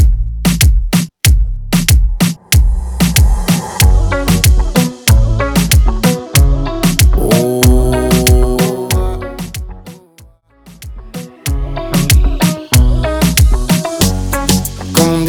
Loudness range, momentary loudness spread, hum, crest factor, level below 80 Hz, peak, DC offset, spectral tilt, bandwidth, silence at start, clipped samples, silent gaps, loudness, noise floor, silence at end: 6 LU; 10 LU; none; 12 dB; -14 dBFS; 0 dBFS; under 0.1%; -5 dB/octave; over 20 kHz; 0 s; under 0.1%; none; -12 LUFS; -43 dBFS; 0 s